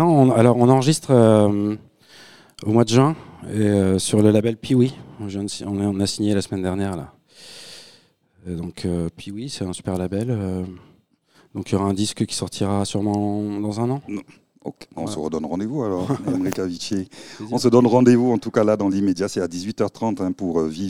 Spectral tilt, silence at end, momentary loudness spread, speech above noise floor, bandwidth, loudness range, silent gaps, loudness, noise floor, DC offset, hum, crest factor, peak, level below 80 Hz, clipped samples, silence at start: -6.5 dB/octave; 0 s; 18 LU; 38 dB; 15 kHz; 9 LU; none; -20 LUFS; -58 dBFS; 0.2%; none; 20 dB; 0 dBFS; -54 dBFS; under 0.1%; 0 s